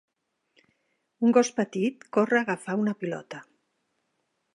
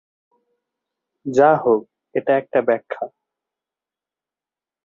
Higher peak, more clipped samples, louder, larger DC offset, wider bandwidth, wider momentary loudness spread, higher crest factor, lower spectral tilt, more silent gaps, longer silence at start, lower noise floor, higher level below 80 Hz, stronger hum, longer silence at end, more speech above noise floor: second, -6 dBFS vs -2 dBFS; neither; second, -26 LUFS vs -19 LUFS; neither; first, 11 kHz vs 7.6 kHz; about the same, 14 LU vs 15 LU; about the same, 22 dB vs 20 dB; second, -5.5 dB/octave vs -7 dB/octave; neither; about the same, 1.2 s vs 1.25 s; second, -76 dBFS vs under -90 dBFS; second, -82 dBFS vs -66 dBFS; neither; second, 1.15 s vs 1.8 s; second, 51 dB vs over 72 dB